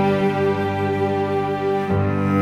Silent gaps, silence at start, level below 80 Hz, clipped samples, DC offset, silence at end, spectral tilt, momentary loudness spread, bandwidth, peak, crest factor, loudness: none; 0 s; -52 dBFS; under 0.1%; under 0.1%; 0 s; -8 dB/octave; 3 LU; 12 kHz; -6 dBFS; 12 dB; -21 LUFS